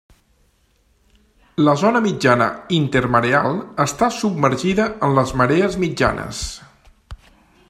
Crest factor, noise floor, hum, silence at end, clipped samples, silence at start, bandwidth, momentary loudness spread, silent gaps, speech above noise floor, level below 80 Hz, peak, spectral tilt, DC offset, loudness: 20 dB; -60 dBFS; none; 0.55 s; under 0.1%; 1.6 s; 14 kHz; 9 LU; none; 42 dB; -42 dBFS; 0 dBFS; -5.5 dB/octave; under 0.1%; -18 LUFS